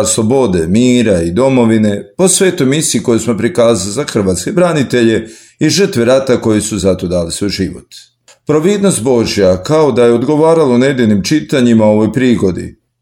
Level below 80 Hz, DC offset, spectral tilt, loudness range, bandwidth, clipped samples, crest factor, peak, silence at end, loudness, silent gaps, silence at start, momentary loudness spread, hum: -40 dBFS; under 0.1%; -5 dB/octave; 3 LU; 17 kHz; under 0.1%; 10 dB; 0 dBFS; 0.3 s; -11 LUFS; none; 0 s; 7 LU; none